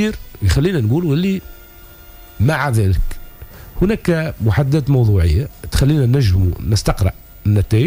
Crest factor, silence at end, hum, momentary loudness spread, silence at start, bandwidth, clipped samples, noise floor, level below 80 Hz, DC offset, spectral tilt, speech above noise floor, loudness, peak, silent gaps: 12 dB; 0 s; none; 8 LU; 0 s; 16 kHz; under 0.1%; -40 dBFS; -28 dBFS; under 0.1%; -7 dB/octave; 25 dB; -17 LUFS; -4 dBFS; none